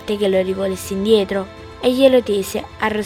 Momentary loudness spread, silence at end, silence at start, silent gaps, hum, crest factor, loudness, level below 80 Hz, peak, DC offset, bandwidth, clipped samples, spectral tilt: 10 LU; 0 s; 0 s; none; none; 18 dB; -18 LUFS; -48 dBFS; 0 dBFS; under 0.1%; 17 kHz; under 0.1%; -5 dB/octave